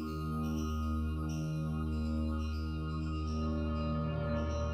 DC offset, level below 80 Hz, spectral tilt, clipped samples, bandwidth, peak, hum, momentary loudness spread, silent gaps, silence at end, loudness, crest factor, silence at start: under 0.1%; -40 dBFS; -7.5 dB/octave; under 0.1%; 14.5 kHz; -24 dBFS; none; 2 LU; none; 0 s; -36 LUFS; 10 dB; 0 s